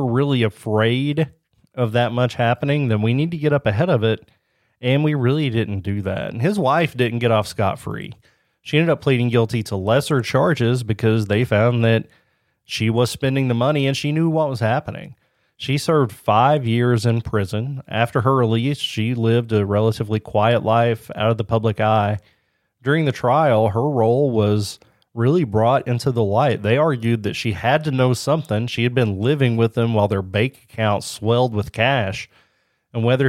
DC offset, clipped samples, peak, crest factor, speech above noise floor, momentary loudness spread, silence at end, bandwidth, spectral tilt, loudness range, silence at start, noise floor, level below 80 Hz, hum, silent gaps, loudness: under 0.1%; under 0.1%; -2 dBFS; 18 dB; 46 dB; 7 LU; 0 s; 14 kHz; -6.5 dB/octave; 2 LU; 0 s; -64 dBFS; -52 dBFS; none; none; -19 LUFS